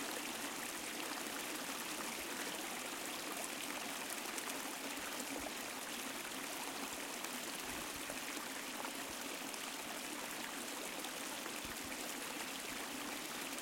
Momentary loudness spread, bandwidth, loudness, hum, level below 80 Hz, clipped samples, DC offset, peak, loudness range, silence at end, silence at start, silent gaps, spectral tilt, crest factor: 2 LU; 17 kHz; -43 LUFS; none; -72 dBFS; under 0.1%; under 0.1%; -22 dBFS; 1 LU; 0 s; 0 s; none; -1 dB/octave; 22 dB